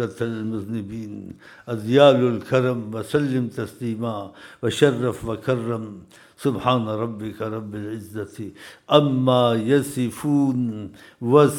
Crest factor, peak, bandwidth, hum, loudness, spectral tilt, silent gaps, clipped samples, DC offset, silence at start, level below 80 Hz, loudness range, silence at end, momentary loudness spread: 20 dB; -2 dBFS; 17.5 kHz; none; -22 LUFS; -6.5 dB/octave; none; under 0.1%; under 0.1%; 0 s; -58 dBFS; 5 LU; 0 s; 17 LU